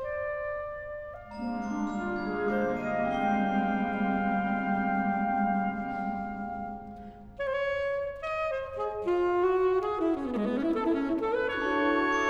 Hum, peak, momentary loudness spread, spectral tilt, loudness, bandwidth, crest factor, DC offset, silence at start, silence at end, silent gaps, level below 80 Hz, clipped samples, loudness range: none; -14 dBFS; 10 LU; -7 dB/octave; -30 LUFS; 7.8 kHz; 16 dB; under 0.1%; 0 s; 0 s; none; -54 dBFS; under 0.1%; 4 LU